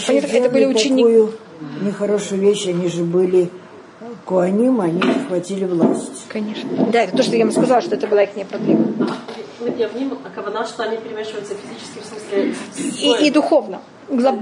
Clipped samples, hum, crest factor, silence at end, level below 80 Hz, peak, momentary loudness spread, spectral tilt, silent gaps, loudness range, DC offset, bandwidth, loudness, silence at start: under 0.1%; none; 14 dB; 0 s; -70 dBFS; -2 dBFS; 15 LU; -5 dB/octave; none; 7 LU; under 0.1%; 11 kHz; -18 LUFS; 0 s